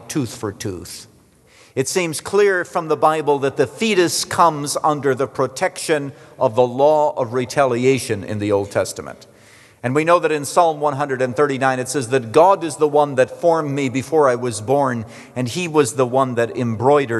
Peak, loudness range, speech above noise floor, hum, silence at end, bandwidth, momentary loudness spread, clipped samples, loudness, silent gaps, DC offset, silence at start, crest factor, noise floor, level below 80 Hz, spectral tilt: -2 dBFS; 3 LU; 33 dB; none; 0 s; 12.5 kHz; 10 LU; under 0.1%; -18 LUFS; none; under 0.1%; 0 s; 16 dB; -50 dBFS; -62 dBFS; -5 dB/octave